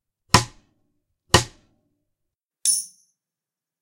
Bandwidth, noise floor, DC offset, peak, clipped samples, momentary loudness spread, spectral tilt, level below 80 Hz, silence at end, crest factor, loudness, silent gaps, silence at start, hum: 16.5 kHz; -89 dBFS; under 0.1%; 0 dBFS; under 0.1%; 17 LU; -2.5 dB/octave; -46 dBFS; 0.95 s; 26 dB; -20 LUFS; none; 0.35 s; none